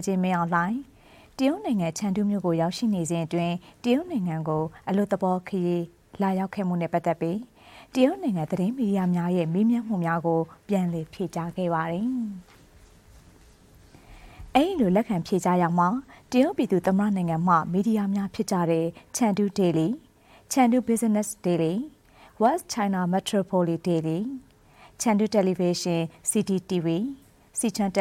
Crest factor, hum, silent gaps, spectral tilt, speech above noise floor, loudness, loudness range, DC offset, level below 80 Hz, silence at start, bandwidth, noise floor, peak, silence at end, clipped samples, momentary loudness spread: 18 dB; none; none; -6 dB/octave; 29 dB; -25 LUFS; 4 LU; under 0.1%; -58 dBFS; 0 s; 16 kHz; -54 dBFS; -8 dBFS; 0 s; under 0.1%; 8 LU